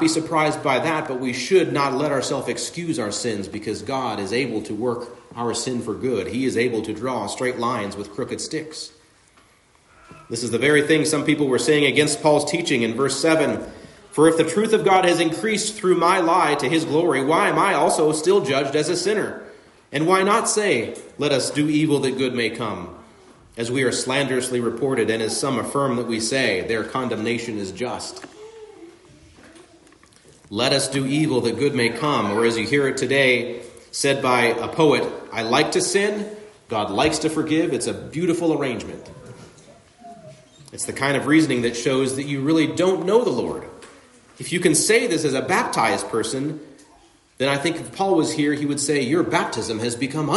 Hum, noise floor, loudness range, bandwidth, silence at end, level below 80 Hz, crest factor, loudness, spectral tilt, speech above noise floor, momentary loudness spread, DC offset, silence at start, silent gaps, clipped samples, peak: none; -56 dBFS; 7 LU; 11.5 kHz; 0 s; -60 dBFS; 18 dB; -21 LUFS; -4 dB/octave; 35 dB; 12 LU; under 0.1%; 0 s; none; under 0.1%; -4 dBFS